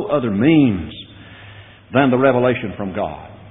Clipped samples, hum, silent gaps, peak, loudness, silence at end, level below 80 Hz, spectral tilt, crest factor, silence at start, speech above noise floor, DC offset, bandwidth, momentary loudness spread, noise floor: under 0.1%; none; none; -2 dBFS; -17 LUFS; 0 s; -48 dBFS; -6 dB/octave; 16 dB; 0 s; 25 dB; under 0.1%; 4 kHz; 20 LU; -41 dBFS